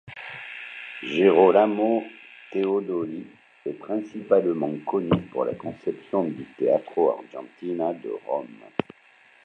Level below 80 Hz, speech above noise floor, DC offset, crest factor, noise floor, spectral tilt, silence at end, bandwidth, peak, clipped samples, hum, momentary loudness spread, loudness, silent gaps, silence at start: -62 dBFS; 32 dB; under 0.1%; 22 dB; -56 dBFS; -8 dB/octave; 0.6 s; 6.8 kHz; -4 dBFS; under 0.1%; none; 17 LU; -25 LUFS; none; 0.05 s